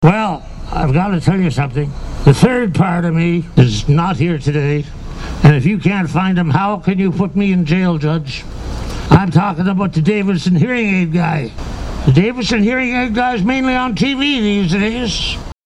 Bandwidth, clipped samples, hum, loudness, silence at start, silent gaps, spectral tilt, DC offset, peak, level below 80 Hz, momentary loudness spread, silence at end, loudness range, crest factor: 11.5 kHz; under 0.1%; none; -14 LUFS; 0 s; none; -7 dB/octave; under 0.1%; 0 dBFS; -30 dBFS; 9 LU; 0.15 s; 1 LU; 14 dB